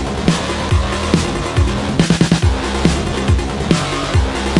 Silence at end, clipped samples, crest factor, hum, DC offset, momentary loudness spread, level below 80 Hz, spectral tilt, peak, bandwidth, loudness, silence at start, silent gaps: 0 s; under 0.1%; 16 dB; none; under 0.1%; 3 LU; -22 dBFS; -5.5 dB/octave; 0 dBFS; 11.5 kHz; -16 LUFS; 0 s; none